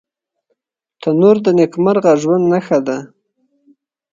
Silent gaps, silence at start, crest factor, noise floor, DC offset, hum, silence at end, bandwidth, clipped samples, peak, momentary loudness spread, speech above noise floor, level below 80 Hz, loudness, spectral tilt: none; 1 s; 16 dB; -69 dBFS; under 0.1%; none; 1.05 s; 7.6 kHz; under 0.1%; 0 dBFS; 11 LU; 57 dB; -62 dBFS; -14 LUFS; -7.5 dB/octave